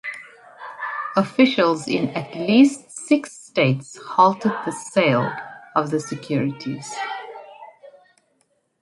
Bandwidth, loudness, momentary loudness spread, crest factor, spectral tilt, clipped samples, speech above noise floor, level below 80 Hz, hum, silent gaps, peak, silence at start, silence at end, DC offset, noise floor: 11.5 kHz; -21 LUFS; 17 LU; 20 dB; -5.5 dB/octave; under 0.1%; 47 dB; -68 dBFS; none; none; -2 dBFS; 0.05 s; 0.95 s; under 0.1%; -67 dBFS